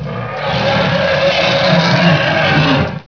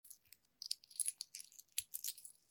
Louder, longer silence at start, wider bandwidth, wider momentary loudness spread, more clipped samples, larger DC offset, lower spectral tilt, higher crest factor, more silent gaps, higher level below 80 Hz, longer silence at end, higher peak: first, -12 LUFS vs -45 LUFS; about the same, 0 s vs 0.05 s; second, 5.4 kHz vs 19 kHz; second, 6 LU vs 13 LU; neither; first, 0.4% vs under 0.1%; first, -6 dB/octave vs 4.5 dB/octave; second, 12 dB vs 32 dB; neither; first, -40 dBFS vs -90 dBFS; second, 0.05 s vs 0.2 s; first, 0 dBFS vs -18 dBFS